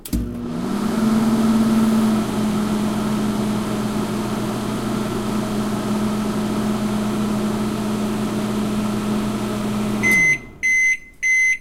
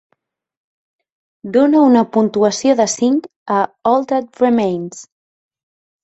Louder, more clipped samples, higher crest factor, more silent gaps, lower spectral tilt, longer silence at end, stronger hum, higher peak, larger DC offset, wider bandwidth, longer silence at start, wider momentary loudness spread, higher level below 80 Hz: second, -20 LUFS vs -15 LUFS; neither; about the same, 14 dB vs 14 dB; second, none vs 3.36-3.46 s; about the same, -5 dB/octave vs -5 dB/octave; second, 0 s vs 1 s; neither; second, -6 dBFS vs -2 dBFS; neither; first, 16 kHz vs 8.2 kHz; second, 0 s vs 1.45 s; about the same, 8 LU vs 9 LU; first, -40 dBFS vs -62 dBFS